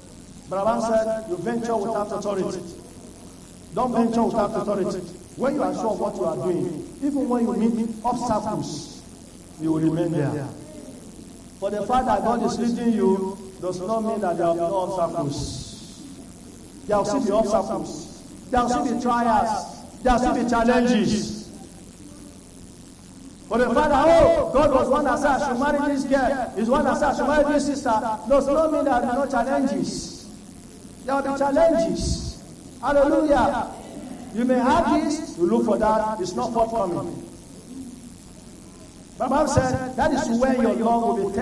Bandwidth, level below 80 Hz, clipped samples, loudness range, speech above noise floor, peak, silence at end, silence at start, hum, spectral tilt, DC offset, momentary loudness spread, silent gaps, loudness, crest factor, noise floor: 12 kHz; -42 dBFS; under 0.1%; 6 LU; 22 dB; -4 dBFS; 0 s; 0 s; none; -5.5 dB/octave; under 0.1%; 23 LU; none; -22 LUFS; 18 dB; -44 dBFS